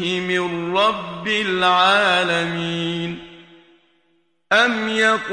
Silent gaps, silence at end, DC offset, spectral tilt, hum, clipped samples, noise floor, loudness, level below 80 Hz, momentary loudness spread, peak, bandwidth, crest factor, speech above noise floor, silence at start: none; 0 s; under 0.1%; -4 dB/octave; none; under 0.1%; -65 dBFS; -18 LUFS; -58 dBFS; 10 LU; -2 dBFS; 10.5 kHz; 18 dB; 46 dB; 0 s